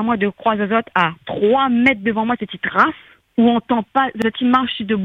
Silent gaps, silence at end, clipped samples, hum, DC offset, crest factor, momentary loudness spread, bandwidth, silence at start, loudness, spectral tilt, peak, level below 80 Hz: none; 0 s; under 0.1%; none; under 0.1%; 18 dB; 6 LU; 6.6 kHz; 0 s; -17 LUFS; -7 dB/octave; 0 dBFS; -54 dBFS